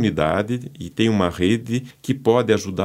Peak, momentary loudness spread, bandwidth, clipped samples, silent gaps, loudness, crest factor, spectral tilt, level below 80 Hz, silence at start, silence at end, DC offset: -2 dBFS; 9 LU; 16 kHz; under 0.1%; none; -21 LUFS; 18 dB; -6 dB/octave; -48 dBFS; 0 s; 0 s; under 0.1%